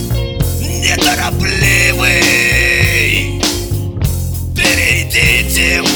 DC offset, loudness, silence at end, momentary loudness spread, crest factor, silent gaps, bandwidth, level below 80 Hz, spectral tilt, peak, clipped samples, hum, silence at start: under 0.1%; -11 LUFS; 0 s; 8 LU; 12 dB; none; over 20 kHz; -22 dBFS; -3 dB/octave; 0 dBFS; under 0.1%; none; 0 s